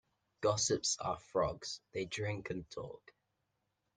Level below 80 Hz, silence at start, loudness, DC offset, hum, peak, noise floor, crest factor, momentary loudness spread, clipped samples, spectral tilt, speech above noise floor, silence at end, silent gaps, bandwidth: -64 dBFS; 0.4 s; -37 LUFS; under 0.1%; none; -18 dBFS; -84 dBFS; 22 dB; 15 LU; under 0.1%; -3 dB/octave; 46 dB; 1 s; none; 10 kHz